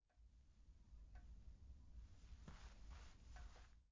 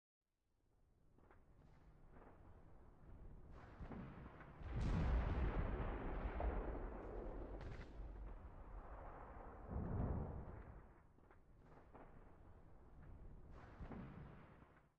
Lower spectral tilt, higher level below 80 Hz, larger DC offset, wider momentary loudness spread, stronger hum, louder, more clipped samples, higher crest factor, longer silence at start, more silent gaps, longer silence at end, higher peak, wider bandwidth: second, -5 dB/octave vs -7.5 dB/octave; second, -62 dBFS vs -52 dBFS; neither; second, 3 LU vs 23 LU; neither; second, -64 LUFS vs -49 LUFS; neither; about the same, 14 dB vs 18 dB; second, 0.05 s vs 1.05 s; neither; second, 0 s vs 0.2 s; second, -46 dBFS vs -32 dBFS; about the same, 7.6 kHz vs 7 kHz